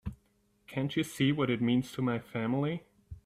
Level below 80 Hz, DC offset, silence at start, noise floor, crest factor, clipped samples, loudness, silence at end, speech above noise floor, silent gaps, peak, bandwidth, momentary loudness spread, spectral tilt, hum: -58 dBFS; under 0.1%; 0.05 s; -71 dBFS; 18 dB; under 0.1%; -32 LUFS; 0.05 s; 40 dB; none; -14 dBFS; 15 kHz; 10 LU; -6.5 dB/octave; none